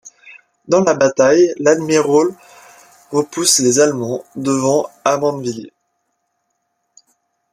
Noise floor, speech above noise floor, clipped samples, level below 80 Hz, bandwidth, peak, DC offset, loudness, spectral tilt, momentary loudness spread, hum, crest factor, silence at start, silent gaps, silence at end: -70 dBFS; 55 dB; under 0.1%; -62 dBFS; 15 kHz; 0 dBFS; under 0.1%; -15 LUFS; -3.5 dB/octave; 11 LU; none; 16 dB; 0.05 s; none; 1.85 s